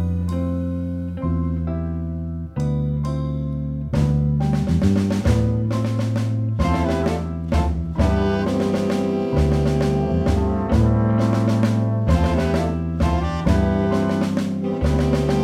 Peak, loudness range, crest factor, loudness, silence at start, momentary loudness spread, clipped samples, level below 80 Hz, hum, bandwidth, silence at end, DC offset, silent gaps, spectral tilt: -4 dBFS; 4 LU; 14 dB; -21 LUFS; 0 s; 7 LU; under 0.1%; -28 dBFS; none; 12.5 kHz; 0 s; under 0.1%; none; -8 dB/octave